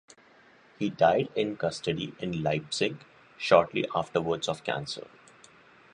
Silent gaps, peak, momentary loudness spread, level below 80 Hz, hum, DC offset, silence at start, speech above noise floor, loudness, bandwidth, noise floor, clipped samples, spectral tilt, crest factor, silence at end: none; -4 dBFS; 11 LU; -62 dBFS; none; under 0.1%; 0.8 s; 30 dB; -28 LUFS; 11 kHz; -58 dBFS; under 0.1%; -5 dB/octave; 24 dB; 0.95 s